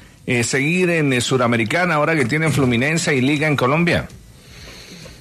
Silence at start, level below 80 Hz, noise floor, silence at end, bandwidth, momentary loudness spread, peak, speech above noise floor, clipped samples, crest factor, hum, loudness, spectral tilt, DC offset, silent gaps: 0.25 s; -46 dBFS; -40 dBFS; 0.05 s; 13.5 kHz; 20 LU; -6 dBFS; 23 dB; under 0.1%; 14 dB; none; -17 LUFS; -5 dB/octave; under 0.1%; none